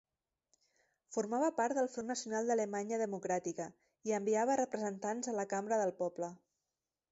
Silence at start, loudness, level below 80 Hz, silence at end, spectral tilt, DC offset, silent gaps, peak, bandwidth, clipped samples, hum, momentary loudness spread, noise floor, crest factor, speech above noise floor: 1.1 s; -37 LUFS; -84 dBFS; 0.75 s; -5 dB/octave; under 0.1%; none; -22 dBFS; 8 kHz; under 0.1%; none; 9 LU; under -90 dBFS; 16 dB; over 54 dB